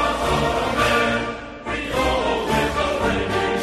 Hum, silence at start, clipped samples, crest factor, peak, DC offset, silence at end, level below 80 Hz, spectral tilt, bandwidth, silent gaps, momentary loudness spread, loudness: none; 0 s; under 0.1%; 14 dB; -6 dBFS; under 0.1%; 0 s; -34 dBFS; -4.5 dB/octave; 13.5 kHz; none; 8 LU; -21 LUFS